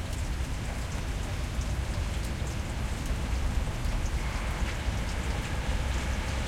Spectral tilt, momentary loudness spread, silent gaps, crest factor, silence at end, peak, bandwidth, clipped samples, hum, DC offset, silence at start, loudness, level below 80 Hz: -5 dB/octave; 3 LU; none; 14 dB; 0 s; -16 dBFS; 16 kHz; under 0.1%; none; under 0.1%; 0 s; -33 LUFS; -32 dBFS